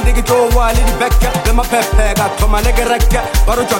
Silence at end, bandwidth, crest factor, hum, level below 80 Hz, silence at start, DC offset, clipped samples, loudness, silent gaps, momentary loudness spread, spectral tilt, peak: 0 s; 16.5 kHz; 10 dB; none; -14 dBFS; 0 s; under 0.1%; under 0.1%; -13 LUFS; none; 2 LU; -4.5 dB/octave; 0 dBFS